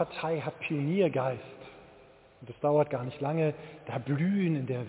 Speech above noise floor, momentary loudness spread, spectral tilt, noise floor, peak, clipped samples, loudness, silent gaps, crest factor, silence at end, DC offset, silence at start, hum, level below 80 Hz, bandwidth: 26 dB; 16 LU; -7 dB/octave; -57 dBFS; -14 dBFS; under 0.1%; -30 LUFS; none; 16 dB; 0 s; under 0.1%; 0 s; none; -68 dBFS; 4 kHz